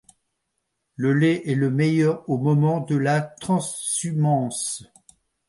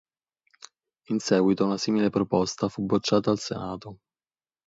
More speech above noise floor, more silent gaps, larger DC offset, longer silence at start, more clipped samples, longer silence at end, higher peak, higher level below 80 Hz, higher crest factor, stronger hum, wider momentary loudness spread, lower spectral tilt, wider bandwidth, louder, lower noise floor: second, 55 dB vs over 65 dB; neither; neither; about the same, 1 s vs 1.1 s; neither; about the same, 0.65 s vs 0.75 s; about the same, -8 dBFS vs -8 dBFS; about the same, -64 dBFS vs -60 dBFS; second, 14 dB vs 20 dB; neither; second, 6 LU vs 11 LU; about the same, -6 dB/octave vs -5.5 dB/octave; first, 11.5 kHz vs 8 kHz; first, -22 LUFS vs -25 LUFS; second, -77 dBFS vs under -90 dBFS